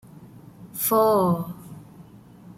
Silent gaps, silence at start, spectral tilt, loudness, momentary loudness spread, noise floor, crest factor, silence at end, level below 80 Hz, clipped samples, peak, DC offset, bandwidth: none; 0.2 s; -6 dB/octave; -21 LUFS; 24 LU; -47 dBFS; 16 dB; 0.55 s; -60 dBFS; under 0.1%; -10 dBFS; under 0.1%; 16.5 kHz